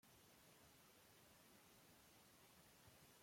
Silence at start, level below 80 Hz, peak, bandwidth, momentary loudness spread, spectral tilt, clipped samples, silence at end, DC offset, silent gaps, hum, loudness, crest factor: 0 s; -88 dBFS; -56 dBFS; 16.5 kHz; 1 LU; -3 dB/octave; under 0.1%; 0 s; under 0.1%; none; none; -69 LUFS; 14 dB